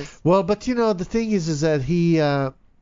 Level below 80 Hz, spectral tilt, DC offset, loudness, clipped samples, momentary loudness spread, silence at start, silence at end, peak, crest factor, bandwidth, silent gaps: -44 dBFS; -7 dB/octave; under 0.1%; -21 LUFS; under 0.1%; 5 LU; 0 s; 0.3 s; -6 dBFS; 14 dB; 7.6 kHz; none